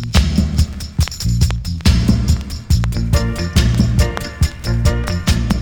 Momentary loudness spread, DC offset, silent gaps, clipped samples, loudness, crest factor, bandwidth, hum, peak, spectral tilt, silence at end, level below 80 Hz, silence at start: 5 LU; under 0.1%; none; under 0.1%; -17 LUFS; 12 dB; 19.5 kHz; none; -2 dBFS; -5.5 dB/octave; 0 s; -18 dBFS; 0 s